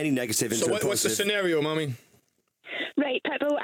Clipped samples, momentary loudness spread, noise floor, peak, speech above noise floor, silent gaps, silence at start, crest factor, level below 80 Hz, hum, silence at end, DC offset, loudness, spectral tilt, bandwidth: under 0.1%; 10 LU; -67 dBFS; -12 dBFS; 41 dB; none; 0 s; 14 dB; -70 dBFS; none; 0 s; under 0.1%; -26 LUFS; -3.5 dB/octave; over 20 kHz